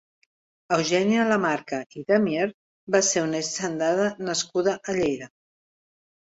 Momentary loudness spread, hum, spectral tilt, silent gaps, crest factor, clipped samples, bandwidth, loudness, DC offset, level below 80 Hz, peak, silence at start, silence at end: 8 LU; none; -3.5 dB/octave; 1.86-1.90 s, 2.54-2.87 s; 18 dB; under 0.1%; 8.2 kHz; -24 LUFS; under 0.1%; -64 dBFS; -6 dBFS; 0.7 s; 1.1 s